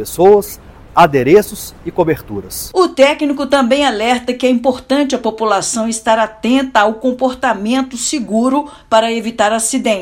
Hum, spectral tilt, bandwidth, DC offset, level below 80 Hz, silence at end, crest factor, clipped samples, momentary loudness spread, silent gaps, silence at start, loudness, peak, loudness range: none; -4 dB/octave; 17.5 kHz; under 0.1%; -42 dBFS; 0 s; 14 dB; 0.4%; 8 LU; none; 0 s; -14 LUFS; 0 dBFS; 2 LU